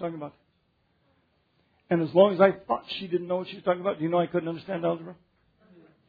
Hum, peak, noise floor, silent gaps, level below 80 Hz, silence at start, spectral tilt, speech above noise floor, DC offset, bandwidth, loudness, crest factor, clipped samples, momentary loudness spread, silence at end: none; -6 dBFS; -70 dBFS; none; -70 dBFS; 0 s; -9.5 dB/octave; 44 dB; under 0.1%; 5 kHz; -26 LUFS; 22 dB; under 0.1%; 15 LU; 0.95 s